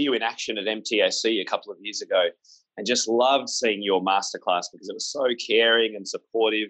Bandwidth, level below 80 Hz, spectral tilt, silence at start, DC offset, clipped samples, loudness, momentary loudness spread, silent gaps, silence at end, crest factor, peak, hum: 9.2 kHz; -82 dBFS; -1.5 dB/octave; 0 s; under 0.1%; under 0.1%; -24 LUFS; 10 LU; none; 0 s; 18 dB; -8 dBFS; none